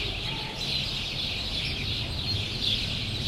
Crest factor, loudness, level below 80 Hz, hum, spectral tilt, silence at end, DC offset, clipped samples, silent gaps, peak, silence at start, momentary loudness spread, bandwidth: 16 dB; -28 LUFS; -40 dBFS; none; -3.5 dB/octave; 0 s; under 0.1%; under 0.1%; none; -14 dBFS; 0 s; 4 LU; 15 kHz